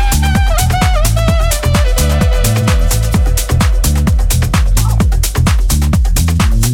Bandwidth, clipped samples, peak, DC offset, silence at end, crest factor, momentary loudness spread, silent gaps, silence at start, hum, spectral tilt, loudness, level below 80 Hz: 18 kHz; under 0.1%; 0 dBFS; under 0.1%; 0 s; 10 dB; 1 LU; none; 0 s; none; -5 dB/octave; -13 LUFS; -12 dBFS